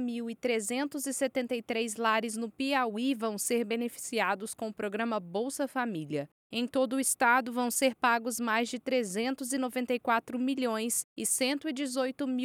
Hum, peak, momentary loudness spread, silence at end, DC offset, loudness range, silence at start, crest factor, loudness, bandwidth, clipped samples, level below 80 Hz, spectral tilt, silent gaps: none; -14 dBFS; 7 LU; 0 s; under 0.1%; 4 LU; 0 s; 18 dB; -31 LUFS; over 20 kHz; under 0.1%; -80 dBFS; -2.5 dB/octave; 6.32-6.50 s, 11.04-11.16 s